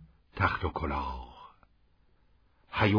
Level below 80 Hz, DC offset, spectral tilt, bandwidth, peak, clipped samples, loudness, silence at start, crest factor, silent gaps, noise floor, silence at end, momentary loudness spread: -46 dBFS; under 0.1%; -8 dB/octave; 5.2 kHz; -12 dBFS; under 0.1%; -32 LUFS; 0 s; 22 dB; none; -66 dBFS; 0 s; 20 LU